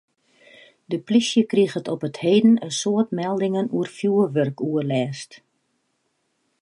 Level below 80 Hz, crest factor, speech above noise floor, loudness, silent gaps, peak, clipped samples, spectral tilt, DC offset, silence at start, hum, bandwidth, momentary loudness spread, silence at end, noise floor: -74 dBFS; 16 dB; 51 dB; -21 LUFS; none; -6 dBFS; under 0.1%; -5.5 dB/octave; under 0.1%; 0.9 s; none; 11.5 kHz; 11 LU; 1.25 s; -71 dBFS